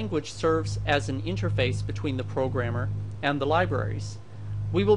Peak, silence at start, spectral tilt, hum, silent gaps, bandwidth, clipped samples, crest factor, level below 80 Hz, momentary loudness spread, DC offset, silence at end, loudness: -8 dBFS; 0 s; -6.5 dB/octave; none; none; 10.5 kHz; under 0.1%; 18 dB; -46 dBFS; 9 LU; 0.6%; 0 s; -28 LUFS